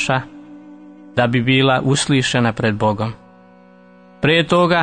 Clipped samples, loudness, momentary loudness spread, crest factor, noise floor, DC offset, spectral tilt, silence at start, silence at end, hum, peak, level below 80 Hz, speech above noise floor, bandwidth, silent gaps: under 0.1%; -17 LUFS; 10 LU; 16 dB; -46 dBFS; under 0.1%; -5 dB/octave; 0 s; 0 s; none; -2 dBFS; -48 dBFS; 30 dB; 9.6 kHz; none